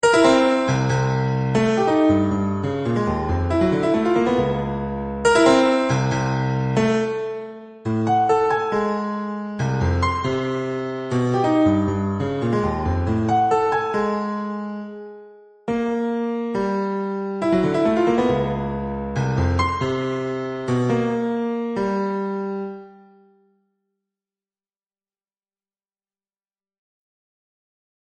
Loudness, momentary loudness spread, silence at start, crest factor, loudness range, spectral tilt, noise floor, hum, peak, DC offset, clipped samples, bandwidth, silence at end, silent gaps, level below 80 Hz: -21 LUFS; 9 LU; 0.05 s; 20 dB; 6 LU; -6.5 dB/octave; under -90 dBFS; none; -2 dBFS; under 0.1%; under 0.1%; 9.8 kHz; 5.15 s; none; -42 dBFS